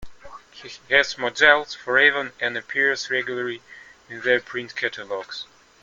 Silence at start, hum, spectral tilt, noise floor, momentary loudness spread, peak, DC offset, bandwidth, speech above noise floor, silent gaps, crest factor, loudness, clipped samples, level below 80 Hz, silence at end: 0 s; none; -2.5 dB/octave; -43 dBFS; 21 LU; -2 dBFS; under 0.1%; 7.8 kHz; 20 dB; none; 22 dB; -21 LUFS; under 0.1%; -58 dBFS; 0.4 s